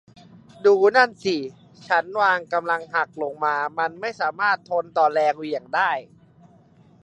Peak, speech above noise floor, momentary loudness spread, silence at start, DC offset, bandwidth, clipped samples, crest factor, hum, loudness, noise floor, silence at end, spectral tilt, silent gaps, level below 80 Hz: -2 dBFS; 32 dB; 9 LU; 0.6 s; under 0.1%; 8.6 kHz; under 0.1%; 20 dB; none; -22 LUFS; -53 dBFS; 1 s; -4.5 dB/octave; none; -72 dBFS